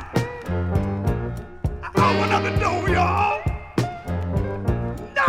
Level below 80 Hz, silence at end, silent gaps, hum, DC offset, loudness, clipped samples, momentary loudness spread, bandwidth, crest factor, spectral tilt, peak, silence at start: -34 dBFS; 0 s; none; none; under 0.1%; -23 LUFS; under 0.1%; 9 LU; 15 kHz; 16 dB; -6.5 dB/octave; -6 dBFS; 0 s